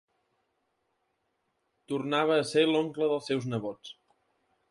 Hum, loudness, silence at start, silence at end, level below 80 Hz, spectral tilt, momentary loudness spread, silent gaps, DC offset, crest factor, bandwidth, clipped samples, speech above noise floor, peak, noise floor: none; -28 LUFS; 1.9 s; 0.8 s; -76 dBFS; -5.5 dB/octave; 14 LU; none; under 0.1%; 18 dB; 11.5 kHz; under 0.1%; 50 dB; -12 dBFS; -78 dBFS